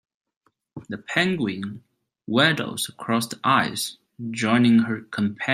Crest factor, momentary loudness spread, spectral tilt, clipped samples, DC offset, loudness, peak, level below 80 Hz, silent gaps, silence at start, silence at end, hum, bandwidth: 22 dB; 17 LU; -4.5 dB/octave; under 0.1%; under 0.1%; -22 LUFS; -2 dBFS; -66 dBFS; none; 0.75 s; 0 s; none; 16 kHz